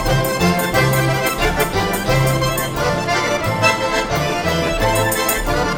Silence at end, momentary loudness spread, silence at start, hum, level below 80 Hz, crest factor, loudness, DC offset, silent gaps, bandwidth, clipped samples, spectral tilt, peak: 0 s; 3 LU; 0 s; none; -30 dBFS; 16 dB; -17 LUFS; under 0.1%; none; 17 kHz; under 0.1%; -4.5 dB/octave; -2 dBFS